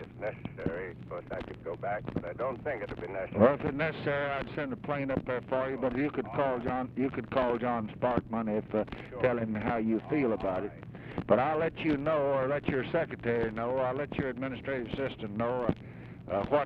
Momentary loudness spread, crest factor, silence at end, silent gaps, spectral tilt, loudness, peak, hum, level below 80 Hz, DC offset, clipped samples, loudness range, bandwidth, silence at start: 10 LU; 22 dB; 0 s; none; -9 dB/octave; -32 LUFS; -10 dBFS; none; -54 dBFS; under 0.1%; under 0.1%; 3 LU; 5.8 kHz; 0 s